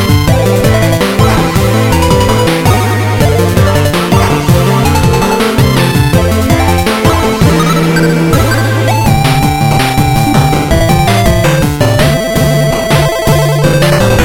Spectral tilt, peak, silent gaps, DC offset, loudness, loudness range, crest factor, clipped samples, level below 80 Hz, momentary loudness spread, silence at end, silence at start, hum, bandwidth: -5.5 dB/octave; 0 dBFS; none; under 0.1%; -9 LUFS; 0 LU; 8 dB; 0.2%; -20 dBFS; 1 LU; 0 s; 0 s; none; 17.5 kHz